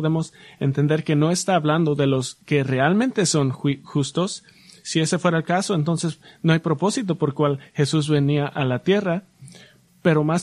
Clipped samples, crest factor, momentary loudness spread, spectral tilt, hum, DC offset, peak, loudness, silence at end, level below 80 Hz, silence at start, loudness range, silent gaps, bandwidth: under 0.1%; 16 dB; 6 LU; -5.5 dB/octave; none; under 0.1%; -4 dBFS; -21 LUFS; 0 s; -60 dBFS; 0 s; 2 LU; none; 12 kHz